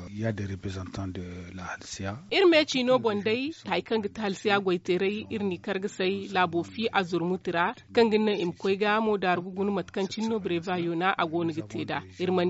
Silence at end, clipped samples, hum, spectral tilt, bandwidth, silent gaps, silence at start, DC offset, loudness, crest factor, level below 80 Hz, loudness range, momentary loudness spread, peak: 0 s; under 0.1%; none; -4 dB/octave; 8 kHz; none; 0 s; under 0.1%; -28 LUFS; 18 dB; -62 dBFS; 3 LU; 12 LU; -10 dBFS